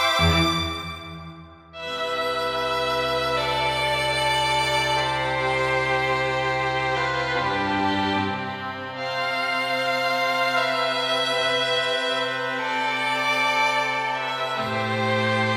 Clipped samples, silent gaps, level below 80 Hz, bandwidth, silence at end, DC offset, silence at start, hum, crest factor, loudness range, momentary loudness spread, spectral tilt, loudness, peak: under 0.1%; none; -46 dBFS; 16 kHz; 0 s; under 0.1%; 0 s; none; 16 dB; 2 LU; 8 LU; -4 dB/octave; -23 LUFS; -8 dBFS